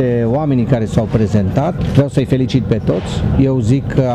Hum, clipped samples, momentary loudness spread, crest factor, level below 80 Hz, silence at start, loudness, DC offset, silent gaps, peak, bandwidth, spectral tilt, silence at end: none; under 0.1%; 3 LU; 14 dB; -30 dBFS; 0 s; -15 LUFS; under 0.1%; none; 0 dBFS; 9.4 kHz; -8.5 dB/octave; 0 s